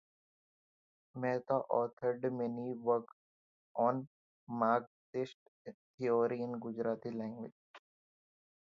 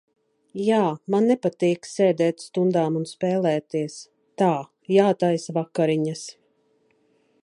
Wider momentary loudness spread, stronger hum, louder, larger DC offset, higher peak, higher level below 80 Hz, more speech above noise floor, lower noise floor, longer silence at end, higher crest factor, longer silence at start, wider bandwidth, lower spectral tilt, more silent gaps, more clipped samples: first, 17 LU vs 9 LU; neither; second, -37 LUFS vs -23 LUFS; neither; second, -18 dBFS vs -4 dBFS; second, -84 dBFS vs -74 dBFS; first, over 54 dB vs 43 dB; first, under -90 dBFS vs -65 dBFS; second, 0.95 s vs 1.15 s; about the same, 20 dB vs 18 dB; first, 1.15 s vs 0.55 s; second, 7.2 kHz vs 11.5 kHz; about the same, -6.5 dB/octave vs -6.5 dB/octave; first, 1.93-1.97 s, 3.13-3.75 s, 4.07-4.47 s, 4.87-5.13 s, 5.34-5.65 s, 5.74-5.98 s, 7.52-7.74 s vs none; neither